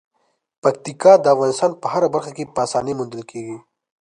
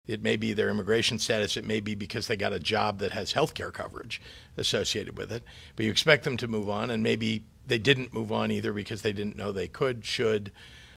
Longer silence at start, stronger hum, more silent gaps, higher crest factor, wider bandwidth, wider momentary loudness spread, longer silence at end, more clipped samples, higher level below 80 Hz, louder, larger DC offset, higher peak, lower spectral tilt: first, 0.65 s vs 0.1 s; neither; neither; second, 18 dB vs 26 dB; second, 10.5 kHz vs 16 kHz; first, 19 LU vs 13 LU; first, 0.45 s vs 0 s; neither; second, -62 dBFS vs -56 dBFS; first, -18 LUFS vs -29 LUFS; neither; first, 0 dBFS vs -4 dBFS; about the same, -5 dB/octave vs -4 dB/octave